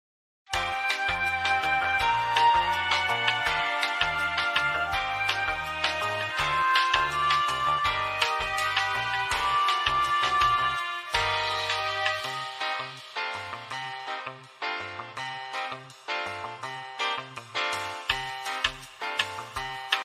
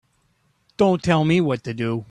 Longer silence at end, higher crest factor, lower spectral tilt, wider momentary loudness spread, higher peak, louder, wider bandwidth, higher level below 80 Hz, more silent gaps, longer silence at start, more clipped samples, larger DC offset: about the same, 0 s vs 0.05 s; first, 24 dB vs 18 dB; second, -1.5 dB/octave vs -7 dB/octave; first, 12 LU vs 8 LU; about the same, -4 dBFS vs -4 dBFS; second, -27 LUFS vs -20 LUFS; first, 15 kHz vs 10.5 kHz; about the same, -52 dBFS vs -54 dBFS; neither; second, 0.5 s vs 0.8 s; neither; neither